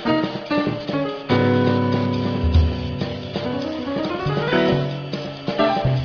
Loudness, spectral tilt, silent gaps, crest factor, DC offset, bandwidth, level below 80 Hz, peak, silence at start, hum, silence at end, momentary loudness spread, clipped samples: -21 LUFS; -8 dB/octave; none; 16 dB; under 0.1%; 5.4 kHz; -32 dBFS; -4 dBFS; 0 s; none; 0 s; 8 LU; under 0.1%